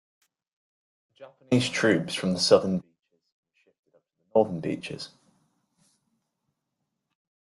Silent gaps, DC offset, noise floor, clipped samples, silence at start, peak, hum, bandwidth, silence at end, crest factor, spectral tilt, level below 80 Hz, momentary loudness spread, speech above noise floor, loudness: 3.32-3.43 s, 3.79-3.83 s; under 0.1%; -82 dBFS; under 0.1%; 1.2 s; -6 dBFS; none; 12 kHz; 2.5 s; 24 dB; -5 dB/octave; -68 dBFS; 15 LU; 57 dB; -25 LUFS